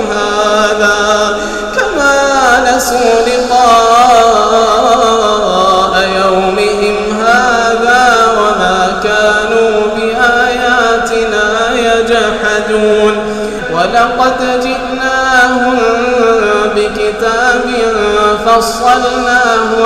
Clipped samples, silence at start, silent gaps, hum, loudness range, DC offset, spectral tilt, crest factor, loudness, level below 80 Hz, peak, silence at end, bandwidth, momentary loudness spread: under 0.1%; 0 s; none; none; 3 LU; under 0.1%; -3 dB/octave; 10 dB; -9 LUFS; -34 dBFS; 0 dBFS; 0 s; 15.5 kHz; 5 LU